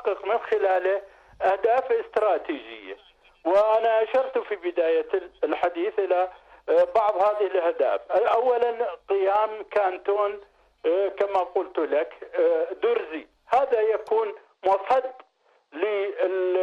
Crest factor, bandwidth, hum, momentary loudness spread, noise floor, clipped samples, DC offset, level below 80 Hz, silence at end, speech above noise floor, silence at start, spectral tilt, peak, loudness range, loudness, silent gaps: 12 dB; 7.2 kHz; none; 9 LU; -60 dBFS; under 0.1%; under 0.1%; -66 dBFS; 0 s; 37 dB; 0 s; -5 dB/octave; -12 dBFS; 2 LU; -24 LUFS; none